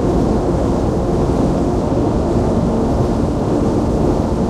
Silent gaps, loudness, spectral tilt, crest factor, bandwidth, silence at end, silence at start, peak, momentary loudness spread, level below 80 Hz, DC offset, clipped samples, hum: none; -16 LUFS; -8.5 dB/octave; 12 dB; 12.5 kHz; 0 s; 0 s; -2 dBFS; 1 LU; -24 dBFS; under 0.1%; under 0.1%; none